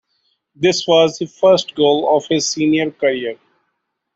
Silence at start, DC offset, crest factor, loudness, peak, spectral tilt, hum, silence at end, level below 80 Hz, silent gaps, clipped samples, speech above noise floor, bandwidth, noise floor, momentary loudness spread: 0.6 s; under 0.1%; 16 dB; -16 LUFS; -2 dBFS; -4 dB/octave; none; 0.8 s; -60 dBFS; none; under 0.1%; 57 dB; 8 kHz; -73 dBFS; 5 LU